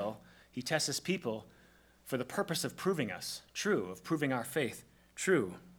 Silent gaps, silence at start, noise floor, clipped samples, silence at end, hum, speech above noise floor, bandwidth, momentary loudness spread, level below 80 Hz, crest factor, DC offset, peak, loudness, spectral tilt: none; 0 s; -64 dBFS; under 0.1%; 0.05 s; none; 28 dB; over 20 kHz; 13 LU; -72 dBFS; 20 dB; under 0.1%; -16 dBFS; -35 LUFS; -4 dB/octave